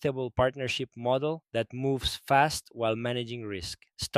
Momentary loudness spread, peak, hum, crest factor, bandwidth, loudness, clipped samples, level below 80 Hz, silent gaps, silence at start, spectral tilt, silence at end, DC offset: 11 LU; -8 dBFS; none; 20 dB; 15.5 kHz; -30 LUFS; under 0.1%; -52 dBFS; none; 0 s; -4.5 dB/octave; 0 s; under 0.1%